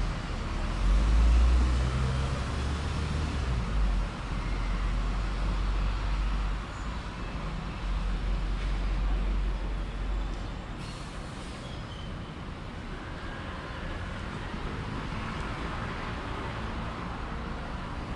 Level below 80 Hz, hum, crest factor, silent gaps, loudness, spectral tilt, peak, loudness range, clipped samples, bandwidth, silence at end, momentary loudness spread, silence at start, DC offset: -32 dBFS; none; 16 dB; none; -33 LUFS; -6 dB/octave; -14 dBFS; 10 LU; under 0.1%; 10.5 kHz; 0 s; 11 LU; 0 s; under 0.1%